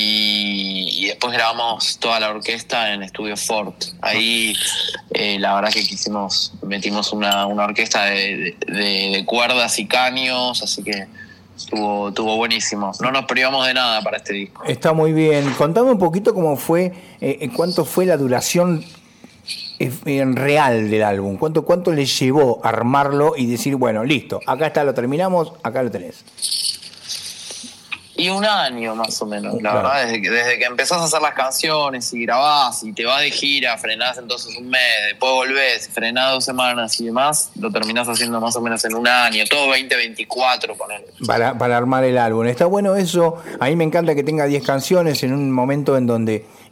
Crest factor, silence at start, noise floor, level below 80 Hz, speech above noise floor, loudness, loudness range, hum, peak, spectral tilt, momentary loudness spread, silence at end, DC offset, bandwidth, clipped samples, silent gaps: 18 dB; 0 s; -45 dBFS; -62 dBFS; 27 dB; -18 LUFS; 3 LU; none; -2 dBFS; -3.5 dB/octave; 9 LU; 0.1 s; under 0.1%; 16.5 kHz; under 0.1%; none